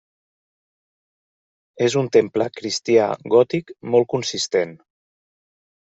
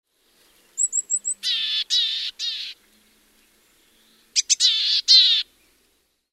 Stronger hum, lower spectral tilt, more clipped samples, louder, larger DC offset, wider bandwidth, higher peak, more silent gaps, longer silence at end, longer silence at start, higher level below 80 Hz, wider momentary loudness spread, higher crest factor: neither; first, -4.5 dB/octave vs 6 dB/octave; neither; about the same, -20 LUFS vs -18 LUFS; neither; second, 8 kHz vs 16 kHz; about the same, -2 dBFS vs -4 dBFS; neither; first, 1.2 s vs 0.9 s; first, 1.75 s vs 0.75 s; first, -66 dBFS vs -72 dBFS; second, 7 LU vs 16 LU; about the same, 20 dB vs 20 dB